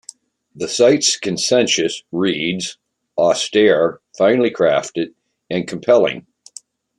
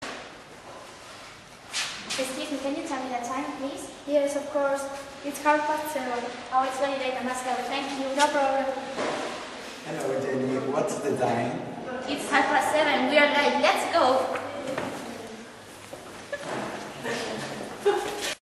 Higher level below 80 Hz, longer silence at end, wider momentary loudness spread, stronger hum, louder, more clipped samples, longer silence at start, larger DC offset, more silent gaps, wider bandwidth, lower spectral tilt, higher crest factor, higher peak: about the same, -62 dBFS vs -64 dBFS; first, 0.8 s vs 0.1 s; second, 12 LU vs 19 LU; neither; first, -17 LUFS vs -27 LUFS; neither; first, 0.55 s vs 0 s; neither; neither; about the same, 12 kHz vs 13 kHz; about the same, -3.5 dB/octave vs -3 dB/octave; second, 16 dB vs 22 dB; first, -2 dBFS vs -6 dBFS